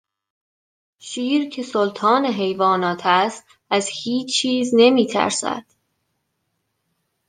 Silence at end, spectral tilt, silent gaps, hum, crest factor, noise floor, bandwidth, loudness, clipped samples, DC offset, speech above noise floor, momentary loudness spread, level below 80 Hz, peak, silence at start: 1.65 s; -3.5 dB/octave; none; none; 18 dB; -73 dBFS; 10 kHz; -19 LUFS; under 0.1%; under 0.1%; 54 dB; 11 LU; -70 dBFS; -2 dBFS; 1.05 s